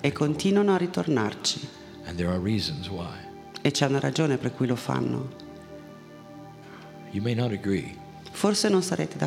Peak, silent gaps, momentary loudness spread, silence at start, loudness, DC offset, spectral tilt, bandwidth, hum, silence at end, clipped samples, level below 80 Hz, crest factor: -6 dBFS; none; 21 LU; 0 s; -26 LUFS; under 0.1%; -5 dB/octave; 15.5 kHz; none; 0 s; under 0.1%; -56 dBFS; 22 dB